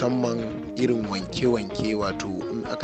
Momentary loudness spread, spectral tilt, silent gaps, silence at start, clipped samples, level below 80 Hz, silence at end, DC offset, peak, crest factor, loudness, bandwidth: 6 LU; -6 dB/octave; none; 0 s; under 0.1%; -50 dBFS; 0 s; under 0.1%; -10 dBFS; 16 dB; -26 LUFS; 8.8 kHz